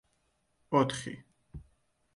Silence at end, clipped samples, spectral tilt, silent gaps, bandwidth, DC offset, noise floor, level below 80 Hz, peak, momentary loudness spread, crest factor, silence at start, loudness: 0.55 s; under 0.1%; -5.5 dB/octave; none; 11.5 kHz; under 0.1%; -75 dBFS; -60 dBFS; -12 dBFS; 24 LU; 24 dB; 0.7 s; -31 LUFS